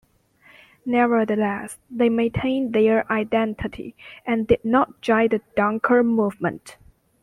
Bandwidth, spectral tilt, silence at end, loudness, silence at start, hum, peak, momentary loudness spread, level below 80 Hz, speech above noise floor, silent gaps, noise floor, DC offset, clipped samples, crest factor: 12 kHz; -6.5 dB/octave; 0.5 s; -21 LUFS; 0.85 s; none; -4 dBFS; 13 LU; -50 dBFS; 35 dB; none; -56 dBFS; under 0.1%; under 0.1%; 18 dB